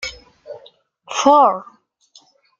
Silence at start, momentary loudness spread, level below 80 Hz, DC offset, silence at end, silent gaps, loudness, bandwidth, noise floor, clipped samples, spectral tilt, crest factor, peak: 0 s; 26 LU; -56 dBFS; under 0.1%; 1 s; none; -15 LUFS; 7.8 kHz; -53 dBFS; under 0.1%; -2.5 dB/octave; 18 dB; -2 dBFS